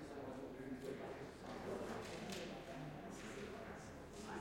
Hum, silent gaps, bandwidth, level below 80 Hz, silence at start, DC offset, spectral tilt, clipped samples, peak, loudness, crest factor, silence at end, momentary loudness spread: none; none; 16.5 kHz; -66 dBFS; 0 s; under 0.1%; -5 dB/octave; under 0.1%; -32 dBFS; -50 LUFS; 18 dB; 0 s; 5 LU